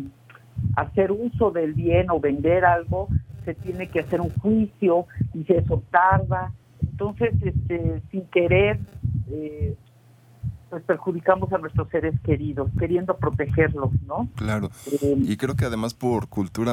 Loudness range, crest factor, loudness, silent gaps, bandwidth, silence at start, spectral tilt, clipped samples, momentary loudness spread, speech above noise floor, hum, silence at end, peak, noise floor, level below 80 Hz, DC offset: 3 LU; 20 dB; -24 LUFS; none; 15 kHz; 0 s; -8 dB/octave; under 0.1%; 12 LU; 30 dB; none; 0 s; -2 dBFS; -53 dBFS; -42 dBFS; under 0.1%